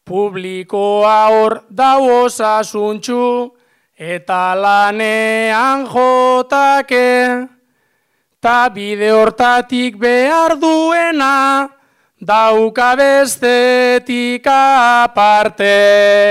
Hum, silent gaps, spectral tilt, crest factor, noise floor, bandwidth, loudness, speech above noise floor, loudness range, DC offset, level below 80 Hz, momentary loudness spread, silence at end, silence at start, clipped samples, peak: none; none; -3.5 dB/octave; 10 dB; -64 dBFS; 16 kHz; -12 LUFS; 52 dB; 4 LU; under 0.1%; -54 dBFS; 9 LU; 0 s; 0.05 s; under 0.1%; -2 dBFS